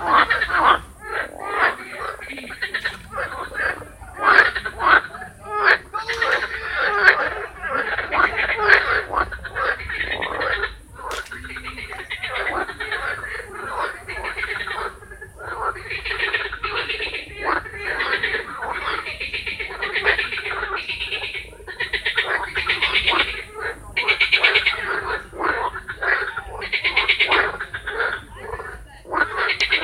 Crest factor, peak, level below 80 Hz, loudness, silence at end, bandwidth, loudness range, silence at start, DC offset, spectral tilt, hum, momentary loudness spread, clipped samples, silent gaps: 22 dB; 0 dBFS; -44 dBFS; -21 LUFS; 0 s; 16 kHz; 8 LU; 0 s; under 0.1%; -3 dB/octave; none; 15 LU; under 0.1%; none